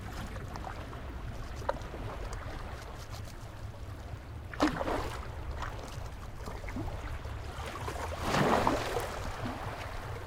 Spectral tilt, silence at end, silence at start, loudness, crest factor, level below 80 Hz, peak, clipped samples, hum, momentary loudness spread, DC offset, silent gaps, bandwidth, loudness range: -5.5 dB/octave; 0 s; 0 s; -37 LUFS; 24 dB; -44 dBFS; -12 dBFS; under 0.1%; none; 14 LU; under 0.1%; none; 17 kHz; 8 LU